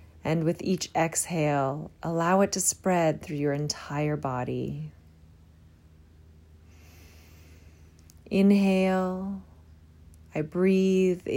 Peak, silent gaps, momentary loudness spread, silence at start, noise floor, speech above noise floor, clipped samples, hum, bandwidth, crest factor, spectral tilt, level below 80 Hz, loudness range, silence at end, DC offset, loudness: -12 dBFS; none; 12 LU; 0.25 s; -55 dBFS; 29 dB; under 0.1%; none; 16 kHz; 16 dB; -5.5 dB/octave; -58 dBFS; 10 LU; 0 s; under 0.1%; -26 LUFS